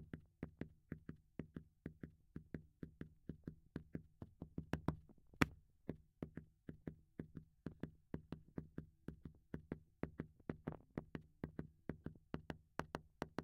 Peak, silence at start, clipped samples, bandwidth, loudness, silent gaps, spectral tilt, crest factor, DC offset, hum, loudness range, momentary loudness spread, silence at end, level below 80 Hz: -12 dBFS; 0 s; under 0.1%; 16 kHz; -52 LUFS; none; -6.5 dB/octave; 40 dB; under 0.1%; none; 8 LU; 11 LU; 0 s; -66 dBFS